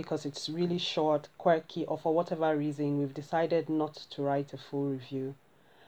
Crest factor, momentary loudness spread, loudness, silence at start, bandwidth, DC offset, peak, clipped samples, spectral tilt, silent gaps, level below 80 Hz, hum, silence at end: 18 dB; 8 LU; -32 LUFS; 0 s; 12 kHz; under 0.1%; -14 dBFS; under 0.1%; -6.5 dB/octave; none; -80 dBFS; none; 0.55 s